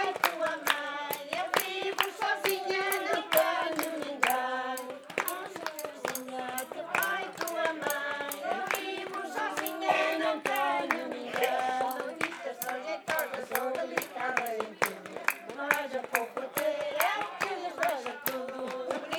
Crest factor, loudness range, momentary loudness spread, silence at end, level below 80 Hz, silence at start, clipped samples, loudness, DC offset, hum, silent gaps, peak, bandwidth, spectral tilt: 26 dB; 4 LU; 7 LU; 0 s; -82 dBFS; 0 s; under 0.1%; -31 LUFS; under 0.1%; none; none; -6 dBFS; 19.5 kHz; -2 dB/octave